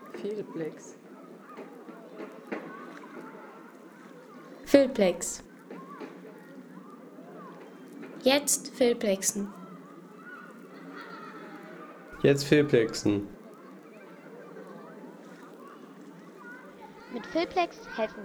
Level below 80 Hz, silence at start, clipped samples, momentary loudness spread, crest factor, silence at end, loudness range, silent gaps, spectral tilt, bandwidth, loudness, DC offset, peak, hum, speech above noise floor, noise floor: -66 dBFS; 0 s; under 0.1%; 24 LU; 26 dB; 0 s; 15 LU; none; -4 dB/octave; over 20 kHz; -28 LUFS; under 0.1%; -6 dBFS; none; 23 dB; -49 dBFS